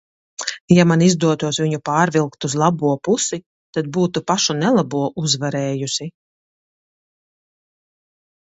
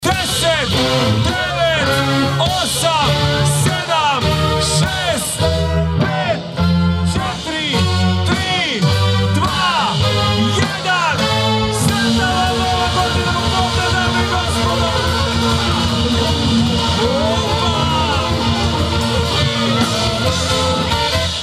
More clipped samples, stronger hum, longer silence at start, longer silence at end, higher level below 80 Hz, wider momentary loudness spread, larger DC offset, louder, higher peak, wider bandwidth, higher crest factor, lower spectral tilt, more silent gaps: neither; neither; first, 0.4 s vs 0 s; first, 2.35 s vs 0 s; second, -58 dBFS vs -30 dBFS; first, 12 LU vs 2 LU; neither; second, -18 LUFS vs -15 LUFS; about the same, 0 dBFS vs 0 dBFS; second, 8.2 kHz vs 15 kHz; about the same, 20 dB vs 16 dB; about the same, -5 dB/octave vs -4.5 dB/octave; first, 0.61-0.68 s, 3.46-3.73 s vs none